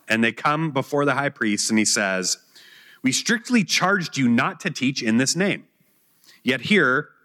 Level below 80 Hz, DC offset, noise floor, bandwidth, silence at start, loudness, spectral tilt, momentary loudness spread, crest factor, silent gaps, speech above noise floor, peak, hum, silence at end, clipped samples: -76 dBFS; under 0.1%; -62 dBFS; 16.5 kHz; 0.1 s; -21 LUFS; -3.5 dB/octave; 6 LU; 16 dB; none; 41 dB; -6 dBFS; none; 0.2 s; under 0.1%